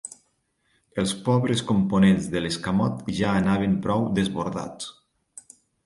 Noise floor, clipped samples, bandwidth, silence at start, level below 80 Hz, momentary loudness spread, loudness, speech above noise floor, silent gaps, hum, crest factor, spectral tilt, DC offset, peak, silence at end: -70 dBFS; under 0.1%; 11.5 kHz; 0.05 s; -50 dBFS; 15 LU; -24 LUFS; 47 dB; none; none; 18 dB; -6 dB/octave; under 0.1%; -8 dBFS; 0.95 s